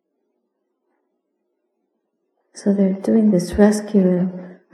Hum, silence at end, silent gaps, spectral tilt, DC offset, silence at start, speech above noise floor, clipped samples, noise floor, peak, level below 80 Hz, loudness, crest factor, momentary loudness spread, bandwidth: none; 0.2 s; none; -7.5 dB/octave; under 0.1%; 2.55 s; 57 dB; under 0.1%; -73 dBFS; 0 dBFS; -46 dBFS; -17 LUFS; 20 dB; 10 LU; 12.5 kHz